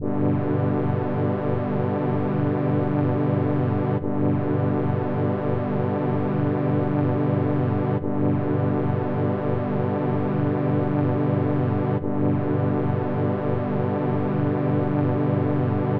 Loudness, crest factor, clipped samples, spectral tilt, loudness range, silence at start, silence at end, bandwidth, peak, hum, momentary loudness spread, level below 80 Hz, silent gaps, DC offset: -23 LUFS; 10 dB; under 0.1%; -12 dB/octave; 1 LU; 0 s; 0 s; 4.7 kHz; -12 dBFS; 50 Hz at -40 dBFS; 2 LU; -60 dBFS; none; under 0.1%